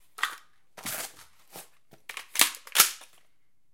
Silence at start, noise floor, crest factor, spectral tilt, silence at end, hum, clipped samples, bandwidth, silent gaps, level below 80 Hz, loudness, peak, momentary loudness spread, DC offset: 0.2 s; -75 dBFS; 30 dB; 1.5 dB/octave; 0.7 s; none; under 0.1%; 17 kHz; none; -76 dBFS; -25 LUFS; -2 dBFS; 25 LU; 0.2%